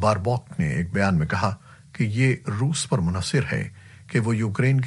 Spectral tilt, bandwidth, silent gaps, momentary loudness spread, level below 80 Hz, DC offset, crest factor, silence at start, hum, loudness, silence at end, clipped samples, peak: -6 dB/octave; 11.5 kHz; none; 6 LU; -48 dBFS; under 0.1%; 18 dB; 0 s; none; -24 LUFS; 0 s; under 0.1%; -6 dBFS